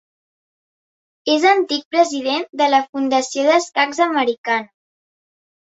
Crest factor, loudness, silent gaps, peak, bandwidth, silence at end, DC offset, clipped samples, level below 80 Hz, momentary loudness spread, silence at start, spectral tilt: 18 dB; -17 LUFS; 1.85-1.91 s, 2.49-2.53 s, 2.89-2.93 s, 4.38-4.44 s; -2 dBFS; 8.2 kHz; 1.15 s; under 0.1%; under 0.1%; -70 dBFS; 7 LU; 1.25 s; -1.5 dB/octave